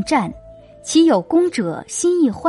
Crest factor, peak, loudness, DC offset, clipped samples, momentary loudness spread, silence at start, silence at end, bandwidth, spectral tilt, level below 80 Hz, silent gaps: 14 dB; -4 dBFS; -17 LUFS; under 0.1%; under 0.1%; 10 LU; 0 s; 0 s; 11.5 kHz; -4.5 dB/octave; -50 dBFS; none